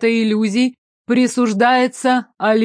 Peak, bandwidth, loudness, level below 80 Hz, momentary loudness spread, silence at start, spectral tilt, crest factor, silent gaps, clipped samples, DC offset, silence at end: -2 dBFS; 10.5 kHz; -16 LUFS; -70 dBFS; 5 LU; 0 s; -4.5 dB/octave; 12 dB; 0.78-1.05 s; under 0.1%; under 0.1%; 0 s